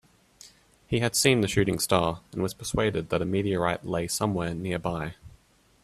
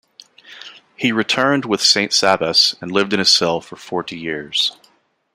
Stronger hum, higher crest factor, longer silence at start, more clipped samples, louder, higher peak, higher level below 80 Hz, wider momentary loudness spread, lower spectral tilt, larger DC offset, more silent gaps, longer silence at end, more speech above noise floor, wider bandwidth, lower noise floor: neither; about the same, 22 dB vs 18 dB; about the same, 0.45 s vs 0.5 s; neither; second, -27 LUFS vs -16 LUFS; second, -6 dBFS vs -2 dBFS; first, -50 dBFS vs -62 dBFS; second, 10 LU vs 13 LU; first, -4.5 dB/octave vs -2.5 dB/octave; neither; neither; about the same, 0.55 s vs 0.6 s; second, 34 dB vs 40 dB; about the same, 15.5 kHz vs 16 kHz; about the same, -60 dBFS vs -57 dBFS